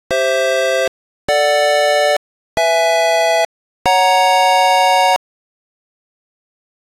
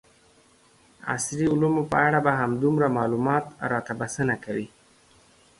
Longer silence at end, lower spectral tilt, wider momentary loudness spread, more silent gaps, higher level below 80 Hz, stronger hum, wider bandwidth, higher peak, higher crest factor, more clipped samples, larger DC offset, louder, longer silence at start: first, 1.7 s vs 0.9 s; second, -0.5 dB/octave vs -6 dB/octave; about the same, 9 LU vs 10 LU; first, 0.88-1.28 s, 2.17-2.57 s, 3.45-3.85 s vs none; first, -52 dBFS vs -58 dBFS; neither; first, 16 kHz vs 11.5 kHz; first, -2 dBFS vs -6 dBFS; second, 14 dB vs 20 dB; neither; neither; first, -14 LUFS vs -24 LUFS; second, 0.1 s vs 1.05 s